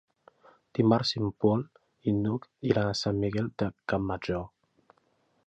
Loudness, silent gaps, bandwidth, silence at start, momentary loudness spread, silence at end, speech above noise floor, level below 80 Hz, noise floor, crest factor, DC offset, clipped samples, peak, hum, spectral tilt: -29 LUFS; none; 8.4 kHz; 0.75 s; 10 LU; 1 s; 42 dB; -54 dBFS; -70 dBFS; 22 dB; under 0.1%; under 0.1%; -8 dBFS; none; -6.5 dB/octave